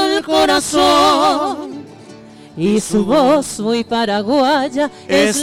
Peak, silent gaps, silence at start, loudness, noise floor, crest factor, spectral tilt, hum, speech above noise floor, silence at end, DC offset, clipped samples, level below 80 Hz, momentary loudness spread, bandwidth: -4 dBFS; none; 0 s; -14 LUFS; -38 dBFS; 10 dB; -3.5 dB/octave; none; 24 dB; 0 s; under 0.1%; under 0.1%; -46 dBFS; 10 LU; 17 kHz